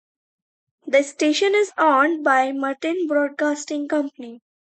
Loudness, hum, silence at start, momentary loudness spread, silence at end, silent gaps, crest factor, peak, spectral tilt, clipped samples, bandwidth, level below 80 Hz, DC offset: -20 LUFS; none; 0.85 s; 10 LU; 0.4 s; none; 18 dB; -4 dBFS; -1.5 dB/octave; under 0.1%; 9 kHz; -78 dBFS; under 0.1%